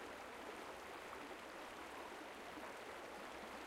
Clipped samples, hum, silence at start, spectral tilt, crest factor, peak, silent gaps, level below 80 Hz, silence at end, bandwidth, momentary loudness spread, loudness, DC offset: under 0.1%; none; 0 s; -3 dB/octave; 14 dB; -38 dBFS; none; -74 dBFS; 0 s; 16 kHz; 1 LU; -52 LUFS; under 0.1%